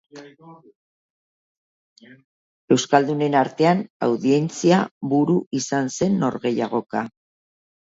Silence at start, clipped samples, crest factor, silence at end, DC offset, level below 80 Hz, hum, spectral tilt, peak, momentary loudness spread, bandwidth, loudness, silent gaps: 0.15 s; under 0.1%; 20 dB; 0.75 s; under 0.1%; -66 dBFS; none; -5.5 dB/octave; -2 dBFS; 6 LU; 8 kHz; -21 LUFS; 0.75-1.96 s, 2.24-2.68 s, 3.90-4.00 s, 4.91-5.01 s, 5.46-5.51 s